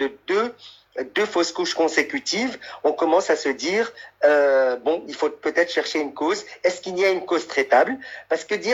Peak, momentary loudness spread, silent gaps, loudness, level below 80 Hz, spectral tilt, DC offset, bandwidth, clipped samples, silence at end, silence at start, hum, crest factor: -4 dBFS; 8 LU; none; -22 LUFS; -68 dBFS; -2.5 dB/octave; under 0.1%; 12.5 kHz; under 0.1%; 0 s; 0 s; none; 18 dB